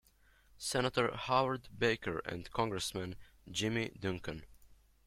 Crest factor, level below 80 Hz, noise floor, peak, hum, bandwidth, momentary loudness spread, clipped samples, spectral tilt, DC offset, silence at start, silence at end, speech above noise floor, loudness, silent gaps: 22 dB; -60 dBFS; -67 dBFS; -16 dBFS; none; 16.5 kHz; 11 LU; under 0.1%; -4 dB/octave; under 0.1%; 0.55 s; 0.35 s; 31 dB; -36 LUFS; none